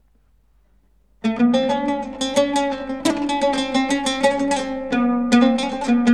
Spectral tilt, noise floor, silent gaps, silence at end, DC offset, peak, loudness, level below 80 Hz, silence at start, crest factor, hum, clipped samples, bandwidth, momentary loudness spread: -4 dB/octave; -59 dBFS; none; 0 s; 0.3%; -4 dBFS; -20 LUFS; -50 dBFS; 1.25 s; 16 dB; none; under 0.1%; 13 kHz; 7 LU